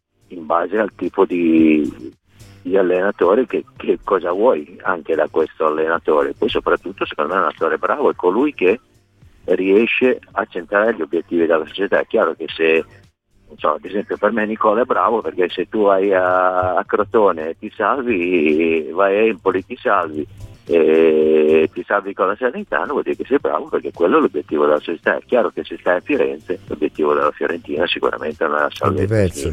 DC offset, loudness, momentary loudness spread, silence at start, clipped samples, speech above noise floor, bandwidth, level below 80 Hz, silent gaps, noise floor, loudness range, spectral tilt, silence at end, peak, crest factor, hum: under 0.1%; -18 LUFS; 9 LU; 0.3 s; under 0.1%; 33 dB; 11.5 kHz; -50 dBFS; none; -50 dBFS; 3 LU; -6.5 dB/octave; 0 s; -2 dBFS; 16 dB; none